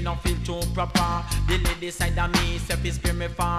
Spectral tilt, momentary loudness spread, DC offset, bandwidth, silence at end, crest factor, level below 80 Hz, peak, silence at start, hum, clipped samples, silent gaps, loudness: -4.5 dB/octave; 4 LU; under 0.1%; 15.5 kHz; 0 s; 18 dB; -28 dBFS; -6 dBFS; 0 s; none; under 0.1%; none; -25 LUFS